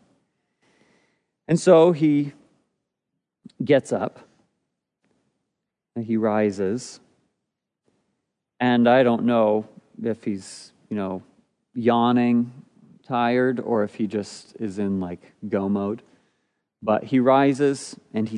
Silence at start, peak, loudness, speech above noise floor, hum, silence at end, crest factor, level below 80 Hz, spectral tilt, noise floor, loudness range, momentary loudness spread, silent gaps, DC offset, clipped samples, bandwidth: 1.5 s; -4 dBFS; -22 LUFS; 61 dB; none; 0 s; 20 dB; -72 dBFS; -6.5 dB/octave; -82 dBFS; 7 LU; 16 LU; none; under 0.1%; under 0.1%; 10.5 kHz